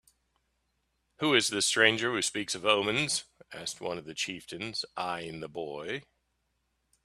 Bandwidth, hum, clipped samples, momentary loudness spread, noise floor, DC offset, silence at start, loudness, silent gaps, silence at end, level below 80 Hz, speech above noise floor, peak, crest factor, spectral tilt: 14.5 kHz; none; under 0.1%; 15 LU; -78 dBFS; under 0.1%; 1.2 s; -29 LUFS; none; 1.05 s; -70 dBFS; 47 dB; -6 dBFS; 26 dB; -2 dB/octave